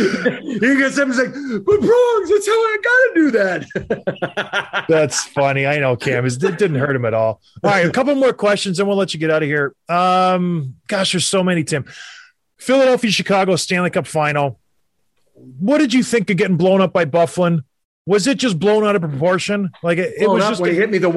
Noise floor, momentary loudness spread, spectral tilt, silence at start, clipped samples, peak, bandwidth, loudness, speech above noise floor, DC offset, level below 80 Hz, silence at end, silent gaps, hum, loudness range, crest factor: -70 dBFS; 8 LU; -5 dB/octave; 0 s; under 0.1%; -4 dBFS; 12.5 kHz; -16 LUFS; 54 dB; under 0.1%; -56 dBFS; 0 s; 17.85-18.05 s; none; 2 LU; 12 dB